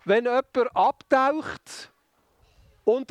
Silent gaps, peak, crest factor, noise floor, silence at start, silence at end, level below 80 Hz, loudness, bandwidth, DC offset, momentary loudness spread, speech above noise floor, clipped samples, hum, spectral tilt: none; -6 dBFS; 18 dB; -66 dBFS; 0.05 s; 0.05 s; -64 dBFS; -24 LUFS; 12.5 kHz; under 0.1%; 17 LU; 43 dB; under 0.1%; none; -5 dB/octave